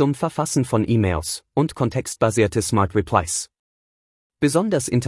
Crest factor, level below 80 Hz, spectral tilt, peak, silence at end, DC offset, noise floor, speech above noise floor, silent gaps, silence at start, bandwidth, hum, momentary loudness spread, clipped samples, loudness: 18 dB; -46 dBFS; -5.5 dB/octave; -2 dBFS; 0 s; under 0.1%; under -90 dBFS; over 70 dB; 3.59-4.30 s; 0 s; 12 kHz; none; 6 LU; under 0.1%; -21 LUFS